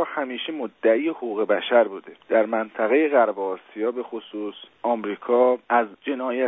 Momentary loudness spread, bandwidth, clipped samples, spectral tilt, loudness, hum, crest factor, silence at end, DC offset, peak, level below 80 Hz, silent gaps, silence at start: 12 LU; 3.9 kHz; under 0.1%; -8 dB/octave; -23 LUFS; none; 18 dB; 0 s; under 0.1%; -6 dBFS; -76 dBFS; none; 0 s